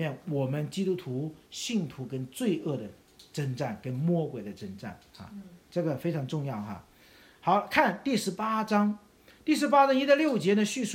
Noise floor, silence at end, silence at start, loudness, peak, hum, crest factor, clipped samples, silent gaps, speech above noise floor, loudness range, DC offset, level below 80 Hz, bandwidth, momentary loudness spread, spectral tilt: -57 dBFS; 0 s; 0 s; -29 LUFS; -8 dBFS; none; 22 dB; under 0.1%; none; 28 dB; 8 LU; under 0.1%; -68 dBFS; 16.5 kHz; 18 LU; -5.5 dB/octave